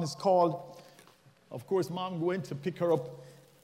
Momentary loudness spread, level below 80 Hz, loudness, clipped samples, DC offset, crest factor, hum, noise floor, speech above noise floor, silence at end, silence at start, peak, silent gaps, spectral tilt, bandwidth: 20 LU; -78 dBFS; -31 LUFS; under 0.1%; under 0.1%; 18 dB; none; -61 dBFS; 30 dB; 0.3 s; 0 s; -14 dBFS; none; -6.5 dB/octave; 16 kHz